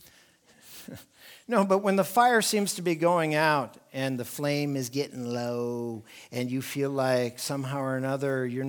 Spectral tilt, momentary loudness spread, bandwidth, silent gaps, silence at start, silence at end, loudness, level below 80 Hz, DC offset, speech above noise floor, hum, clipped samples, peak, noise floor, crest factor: -4.5 dB/octave; 16 LU; 19.5 kHz; none; 0.65 s; 0 s; -27 LUFS; -76 dBFS; under 0.1%; 32 dB; none; under 0.1%; -8 dBFS; -59 dBFS; 20 dB